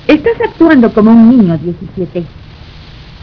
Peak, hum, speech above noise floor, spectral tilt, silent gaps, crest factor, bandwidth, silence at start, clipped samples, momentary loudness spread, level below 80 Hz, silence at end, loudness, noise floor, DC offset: 0 dBFS; none; 24 dB; -9.5 dB/octave; none; 10 dB; 5.4 kHz; 0.05 s; 3%; 16 LU; -36 dBFS; 0.45 s; -8 LUFS; -32 dBFS; under 0.1%